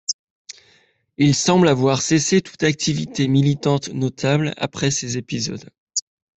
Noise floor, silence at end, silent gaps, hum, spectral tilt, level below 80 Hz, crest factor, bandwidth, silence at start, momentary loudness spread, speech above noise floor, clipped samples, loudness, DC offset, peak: -58 dBFS; 0.35 s; 0.13-0.45 s, 5.78-5.87 s; none; -4.5 dB/octave; -54 dBFS; 16 dB; 8.4 kHz; 0.1 s; 12 LU; 40 dB; under 0.1%; -19 LUFS; under 0.1%; -4 dBFS